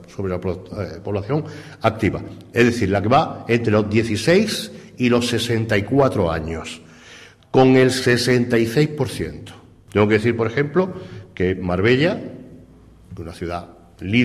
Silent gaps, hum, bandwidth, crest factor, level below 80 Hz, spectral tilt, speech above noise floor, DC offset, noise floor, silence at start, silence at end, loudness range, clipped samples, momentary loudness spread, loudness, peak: none; none; 15 kHz; 16 dB; -42 dBFS; -6 dB/octave; 27 dB; under 0.1%; -46 dBFS; 0 s; 0 s; 4 LU; under 0.1%; 15 LU; -19 LUFS; -4 dBFS